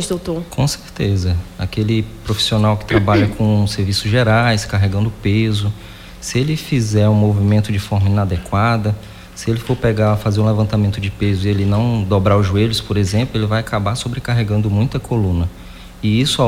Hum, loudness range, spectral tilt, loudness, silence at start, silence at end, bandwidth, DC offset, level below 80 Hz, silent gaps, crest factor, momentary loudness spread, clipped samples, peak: none; 2 LU; -6 dB/octave; -17 LUFS; 0 s; 0 s; 15 kHz; under 0.1%; -36 dBFS; none; 14 dB; 8 LU; under 0.1%; -2 dBFS